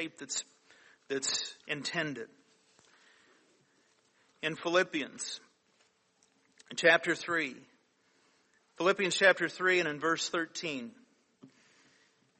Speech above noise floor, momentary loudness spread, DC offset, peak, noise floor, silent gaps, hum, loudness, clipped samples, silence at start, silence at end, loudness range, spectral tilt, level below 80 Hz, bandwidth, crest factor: 40 dB; 15 LU; under 0.1%; -10 dBFS; -71 dBFS; none; none; -31 LUFS; under 0.1%; 0 s; 0.95 s; 8 LU; -2.5 dB/octave; -82 dBFS; 8.4 kHz; 26 dB